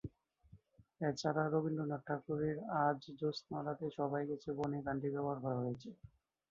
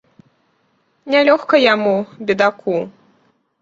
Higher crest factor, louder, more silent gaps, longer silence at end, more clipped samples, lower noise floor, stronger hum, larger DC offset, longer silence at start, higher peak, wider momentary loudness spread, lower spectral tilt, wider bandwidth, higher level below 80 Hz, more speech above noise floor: about the same, 20 dB vs 16 dB; second, -39 LUFS vs -15 LUFS; neither; second, 0.45 s vs 0.75 s; neither; first, -66 dBFS vs -62 dBFS; neither; neither; second, 0.05 s vs 1.05 s; second, -20 dBFS vs -2 dBFS; about the same, 7 LU vs 9 LU; about the same, -6 dB/octave vs -5.5 dB/octave; about the same, 7.4 kHz vs 7.6 kHz; second, -70 dBFS vs -62 dBFS; second, 27 dB vs 47 dB